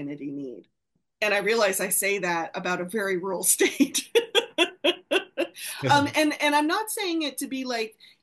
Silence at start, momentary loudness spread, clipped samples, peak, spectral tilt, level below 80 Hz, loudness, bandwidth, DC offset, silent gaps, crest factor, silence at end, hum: 0 s; 10 LU; under 0.1%; -6 dBFS; -2.5 dB/octave; -72 dBFS; -24 LUFS; 13 kHz; under 0.1%; none; 20 dB; 0.3 s; none